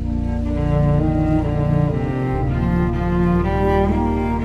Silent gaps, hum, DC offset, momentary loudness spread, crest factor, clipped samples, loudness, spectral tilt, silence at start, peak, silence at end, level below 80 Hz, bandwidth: none; none; 0.5%; 4 LU; 14 dB; under 0.1%; -19 LUFS; -9.5 dB/octave; 0 s; -4 dBFS; 0 s; -24 dBFS; 8 kHz